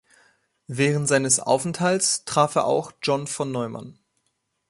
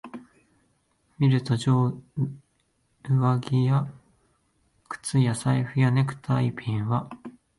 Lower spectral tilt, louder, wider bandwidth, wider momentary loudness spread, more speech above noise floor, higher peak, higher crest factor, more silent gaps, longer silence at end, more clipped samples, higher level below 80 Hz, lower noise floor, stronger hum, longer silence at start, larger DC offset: second, -3.5 dB/octave vs -7 dB/octave; first, -22 LUFS vs -25 LUFS; about the same, 11.5 kHz vs 11.5 kHz; second, 10 LU vs 16 LU; first, 51 dB vs 46 dB; first, -4 dBFS vs -10 dBFS; about the same, 20 dB vs 16 dB; neither; first, 0.75 s vs 0.3 s; neither; about the same, -64 dBFS vs -60 dBFS; first, -74 dBFS vs -70 dBFS; neither; first, 0.7 s vs 0.05 s; neither